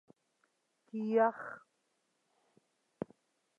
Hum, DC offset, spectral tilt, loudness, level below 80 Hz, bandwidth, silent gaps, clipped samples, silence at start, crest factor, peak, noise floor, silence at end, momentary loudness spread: none; under 0.1%; -8 dB/octave; -33 LUFS; -86 dBFS; 7 kHz; none; under 0.1%; 0.95 s; 22 dB; -16 dBFS; -80 dBFS; 2 s; 17 LU